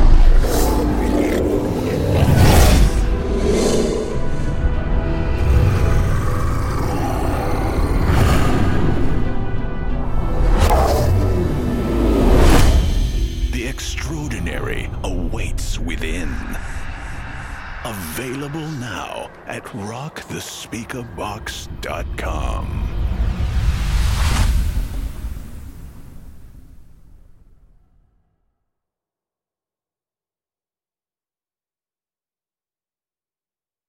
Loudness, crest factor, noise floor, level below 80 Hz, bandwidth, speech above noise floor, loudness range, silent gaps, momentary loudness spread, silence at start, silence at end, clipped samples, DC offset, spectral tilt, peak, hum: -20 LUFS; 16 dB; under -90 dBFS; -20 dBFS; 17 kHz; over 64 dB; 11 LU; none; 14 LU; 0 s; 6.7 s; under 0.1%; under 0.1%; -6 dB/octave; -2 dBFS; none